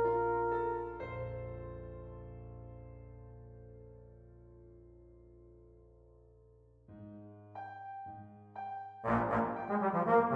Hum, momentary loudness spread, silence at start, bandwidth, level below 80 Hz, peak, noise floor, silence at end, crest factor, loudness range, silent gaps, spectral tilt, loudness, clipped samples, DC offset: none; 26 LU; 0 s; 5.2 kHz; -58 dBFS; -18 dBFS; -63 dBFS; 0 s; 20 dB; 20 LU; none; -9.5 dB/octave; -37 LUFS; under 0.1%; under 0.1%